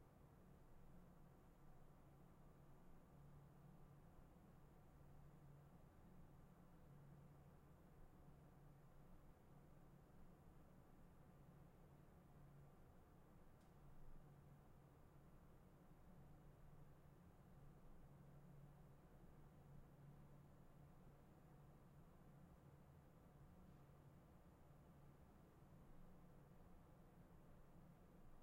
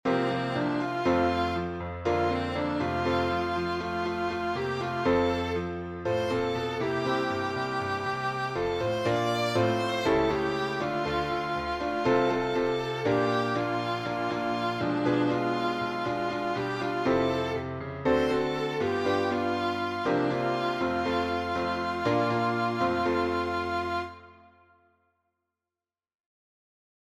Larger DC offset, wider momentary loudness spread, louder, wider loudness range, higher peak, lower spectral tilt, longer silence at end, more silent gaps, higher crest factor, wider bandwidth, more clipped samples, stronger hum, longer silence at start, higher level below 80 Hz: neither; about the same, 3 LU vs 5 LU; second, -69 LUFS vs -28 LUFS; about the same, 2 LU vs 2 LU; second, -52 dBFS vs -12 dBFS; first, -7.5 dB/octave vs -6 dB/octave; second, 0 s vs 2.7 s; neither; about the same, 14 dB vs 16 dB; first, 16 kHz vs 14 kHz; neither; neither; about the same, 0 s vs 0.05 s; second, -70 dBFS vs -52 dBFS